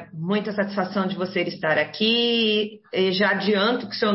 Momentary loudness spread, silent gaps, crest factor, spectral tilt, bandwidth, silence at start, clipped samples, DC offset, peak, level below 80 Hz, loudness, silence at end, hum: 6 LU; none; 16 dB; -8.5 dB/octave; 6 kHz; 0 s; under 0.1%; under 0.1%; -8 dBFS; -68 dBFS; -22 LUFS; 0 s; none